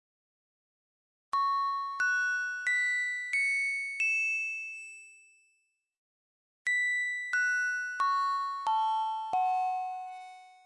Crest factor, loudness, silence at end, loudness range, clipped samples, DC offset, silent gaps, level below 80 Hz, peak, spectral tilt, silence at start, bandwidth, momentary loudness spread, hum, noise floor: 12 dB; -30 LUFS; 0.15 s; 4 LU; under 0.1%; under 0.1%; 5.98-6.65 s; -88 dBFS; -20 dBFS; 2 dB/octave; 1.35 s; 11.5 kHz; 11 LU; none; -76 dBFS